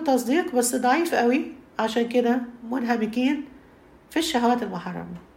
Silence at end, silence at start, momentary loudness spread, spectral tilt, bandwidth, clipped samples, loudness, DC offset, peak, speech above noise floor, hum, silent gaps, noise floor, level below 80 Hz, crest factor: 0.15 s; 0 s; 10 LU; -4 dB/octave; 16 kHz; under 0.1%; -24 LUFS; under 0.1%; -8 dBFS; 28 dB; none; none; -52 dBFS; -62 dBFS; 16 dB